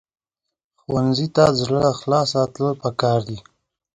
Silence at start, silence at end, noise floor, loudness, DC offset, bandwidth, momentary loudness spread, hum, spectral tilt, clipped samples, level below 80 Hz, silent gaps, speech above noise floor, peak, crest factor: 0.9 s; 0.55 s; -83 dBFS; -20 LUFS; under 0.1%; 10.5 kHz; 8 LU; none; -6 dB/octave; under 0.1%; -52 dBFS; none; 64 dB; 0 dBFS; 20 dB